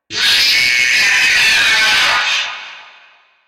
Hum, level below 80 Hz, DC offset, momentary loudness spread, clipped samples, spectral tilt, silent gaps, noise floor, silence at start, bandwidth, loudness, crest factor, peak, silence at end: none; -50 dBFS; under 0.1%; 7 LU; under 0.1%; 1.5 dB/octave; none; -48 dBFS; 0.1 s; 16 kHz; -10 LUFS; 10 dB; -4 dBFS; 0.65 s